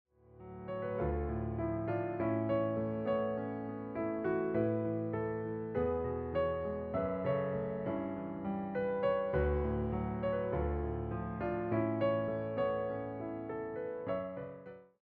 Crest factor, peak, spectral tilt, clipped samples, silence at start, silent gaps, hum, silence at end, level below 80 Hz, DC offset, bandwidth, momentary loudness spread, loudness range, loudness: 16 dB; -20 dBFS; -8 dB/octave; under 0.1%; 0.35 s; none; none; 0.2 s; -50 dBFS; under 0.1%; 4.8 kHz; 8 LU; 1 LU; -36 LUFS